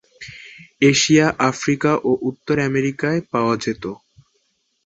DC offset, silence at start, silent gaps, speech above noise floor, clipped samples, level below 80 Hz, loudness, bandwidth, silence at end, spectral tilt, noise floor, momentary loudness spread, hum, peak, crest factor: under 0.1%; 0.2 s; none; 49 dB; under 0.1%; -54 dBFS; -18 LUFS; 8.2 kHz; 0.9 s; -4.5 dB/octave; -67 dBFS; 21 LU; none; -2 dBFS; 18 dB